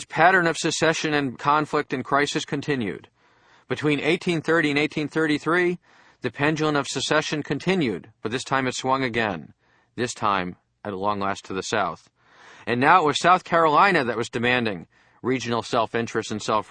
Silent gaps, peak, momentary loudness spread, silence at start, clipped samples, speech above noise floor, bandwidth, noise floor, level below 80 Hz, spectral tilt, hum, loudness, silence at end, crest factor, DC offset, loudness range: none; -2 dBFS; 14 LU; 0 s; under 0.1%; 35 dB; 10 kHz; -58 dBFS; -60 dBFS; -4.5 dB/octave; none; -23 LUFS; 0.05 s; 22 dB; under 0.1%; 6 LU